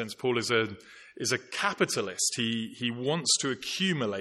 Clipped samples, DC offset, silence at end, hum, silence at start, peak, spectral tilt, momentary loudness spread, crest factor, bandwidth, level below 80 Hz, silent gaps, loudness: under 0.1%; under 0.1%; 0 s; none; 0 s; -12 dBFS; -3 dB/octave; 7 LU; 18 dB; 12.5 kHz; -74 dBFS; none; -29 LUFS